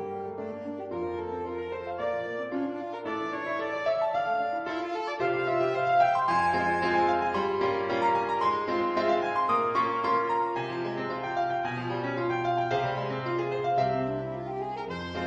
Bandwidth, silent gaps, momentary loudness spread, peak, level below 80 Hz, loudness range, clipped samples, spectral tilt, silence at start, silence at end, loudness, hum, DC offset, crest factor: 8.8 kHz; none; 9 LU; -12 dBFS; -62 dBFS; 6 LU; under 0.1%; -6.5 dB/octave; 0 s; 0 s; -29 LUFS; none; under 0.1%; 16 dB